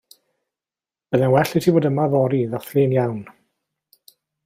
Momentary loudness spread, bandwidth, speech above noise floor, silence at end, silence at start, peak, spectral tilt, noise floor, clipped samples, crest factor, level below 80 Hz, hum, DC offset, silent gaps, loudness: 6 LU; 16 kHz; over 72 dB; 1.15 s; 1.1 s; -4 dBFS; -7.5 dB/octave; under -90 dBFS; under 0.1%; 18 dB; -58 dBFS; none; under 0.1%; none; -19 LUFS